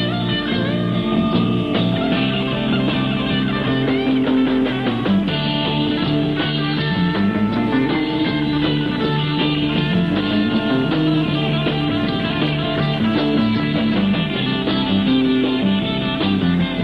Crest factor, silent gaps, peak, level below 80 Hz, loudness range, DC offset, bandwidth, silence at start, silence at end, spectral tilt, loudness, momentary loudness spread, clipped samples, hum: 12 dB; none; -6 dBFS; -40 dBFS; 1 LU; under 0.1%; 6 kHz; 0 s; 0 s; -8 dB/octave; -18 LUFS; 2 LU; under 0.1%; none